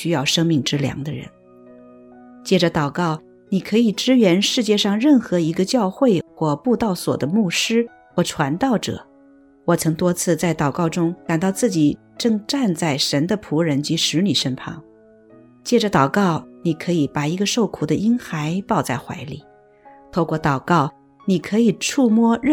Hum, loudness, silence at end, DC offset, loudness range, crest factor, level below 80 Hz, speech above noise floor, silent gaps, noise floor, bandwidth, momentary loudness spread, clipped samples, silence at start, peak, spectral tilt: none; -19 LUFS; 0 s; under 0.1%; 5 LU; 16 dB; -54 dBFS; 31 dB; none; -50 dBFS; 18 kHz; 9 LU; under 0.1%; 0 s; -2 dBFS; -5 dB/octave